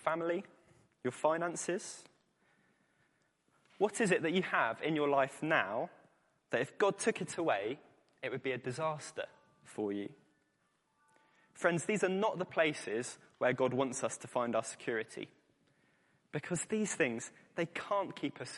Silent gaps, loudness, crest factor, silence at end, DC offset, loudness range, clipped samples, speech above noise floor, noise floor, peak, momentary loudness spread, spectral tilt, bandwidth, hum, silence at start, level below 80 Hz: none; -36 LUFS; 22 dB; 0 s; under 0.1%; 7 LU; under 0.1%; 42 dB; -78 dBFS; -14 dBFS; 12 LU; -4.5 dB/octave; 11.5 kHz; none; 0 s; -82 dBFS